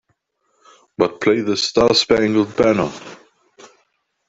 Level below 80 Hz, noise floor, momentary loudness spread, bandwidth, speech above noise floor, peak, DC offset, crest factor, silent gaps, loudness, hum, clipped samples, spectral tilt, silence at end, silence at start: -50 dBFS; -68 dBFS; 18 LU; 8 kHz; 51 dB; 0 dBFS; under 0.1%; 20 dB; none; -17 LUFS; none; under 0.1%; -4.5 dB/octave; 1.15 s; 1 s